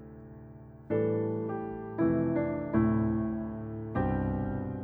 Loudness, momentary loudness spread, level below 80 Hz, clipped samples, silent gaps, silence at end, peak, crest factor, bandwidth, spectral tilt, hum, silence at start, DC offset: -31 LUFS; 21 LU; -48 dBFS; under 0.1%; none; 0 s; -14 dBFS; 16 dB; 3.5 kHz; -12.5 dB/octave; none; 0 s; under 0.1%